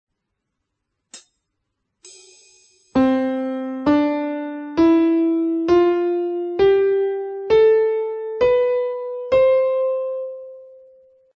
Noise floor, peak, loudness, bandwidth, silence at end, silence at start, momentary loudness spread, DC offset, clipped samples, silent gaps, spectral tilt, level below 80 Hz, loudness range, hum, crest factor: -77 dBFS; -6 dBFS; -19 LUFS; 8.6 kHz; 0.7 s; 1.15 s; 11 LU; under 0.1%; under 0.1%; none; -6.5 dB/octave; -52 dBFS; 8 LU; none; 14 dB